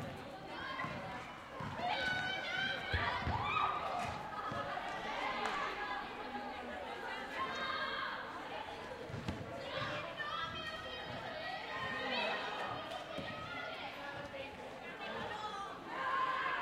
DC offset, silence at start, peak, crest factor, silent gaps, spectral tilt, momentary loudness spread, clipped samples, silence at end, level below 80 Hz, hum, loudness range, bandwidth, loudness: under 0.1%; 0 s; -22 dBFS; 18 dB; none; -4.5 dB/octave; 9 LU; under 0.1%; 0 s; -62 dBFS; none; 5 LU; 16 kHz; -40 LUFS